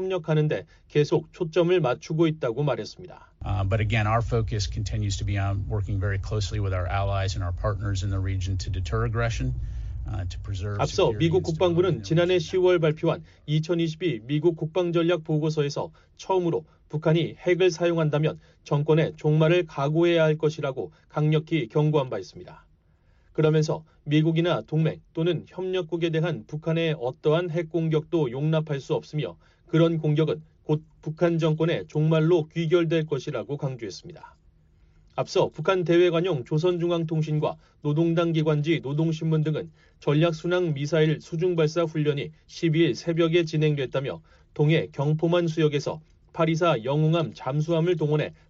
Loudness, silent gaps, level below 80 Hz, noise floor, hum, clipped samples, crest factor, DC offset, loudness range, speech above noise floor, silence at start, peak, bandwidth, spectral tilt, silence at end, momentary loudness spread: -25 LUFS; none; -44 dBFS; -60 dBFS; none; under 0.1%; 14 dB; under 0.1%; 4 LU; 36 dB; 0 s; -10 dBFS; 7.6 kHz; -6.5 dB/octave; 0.15 s; 10 LU